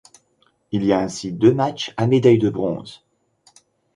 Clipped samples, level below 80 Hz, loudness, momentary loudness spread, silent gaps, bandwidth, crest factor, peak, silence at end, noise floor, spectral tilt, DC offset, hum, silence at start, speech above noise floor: under 0.1%; -54 dBFS; -19 LUFS; 12 LU; none; 11 kHz; 18 dB; -2 dBFS; 1 s; -63 dBFS; -7 dB/octave; under 0.1%; none; 0.7 s; 45 dB